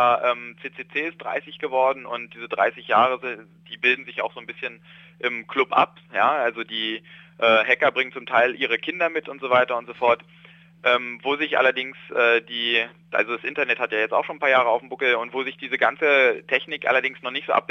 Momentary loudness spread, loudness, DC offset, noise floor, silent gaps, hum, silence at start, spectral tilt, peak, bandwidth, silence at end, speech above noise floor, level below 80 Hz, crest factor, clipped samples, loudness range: 11 LU; -22 LUFS; under 0.1%; -50 dBFS; none; none; 0 s; -4.5 dB/octave; -4 dBFS; 7 kHz; 0.05 s; 27 dB; -74 dBFS; 20 dB; under 0.1%; 3 LU